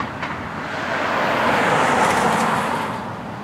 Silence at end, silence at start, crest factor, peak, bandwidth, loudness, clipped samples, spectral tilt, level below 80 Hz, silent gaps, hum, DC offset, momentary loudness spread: 0 s; 0 s; 16 dB; -6 dBFS; 16 kHz; -20 LUFS; under 0.1%; -4 dB/octave; -48 dBFS; none; none; under 0.1%; 10 LU